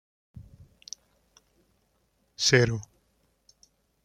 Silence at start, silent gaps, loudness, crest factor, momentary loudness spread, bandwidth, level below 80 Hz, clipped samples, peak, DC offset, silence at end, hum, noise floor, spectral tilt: 0.35 s; none; -24 LUFS; 28 dB; 23 LU; 15 kHz; -58 dBFS; under 0.1%; -4 dBFS; under 0.1%; 1.2 s; none; -71 dBFS; -3.5 dB/octave